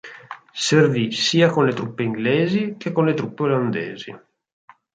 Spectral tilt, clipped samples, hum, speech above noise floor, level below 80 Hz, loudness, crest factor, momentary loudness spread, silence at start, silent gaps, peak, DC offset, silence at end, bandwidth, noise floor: -5.5 dB/octave; under 0.1%; none; 20 dB; -64 dBFS; -20 LUFS; 18 dB; 18 LU; 0.05 s; none; -2 dBFS; under 0.1%; 0.75 s; 9.4 kHz; -40 dBFS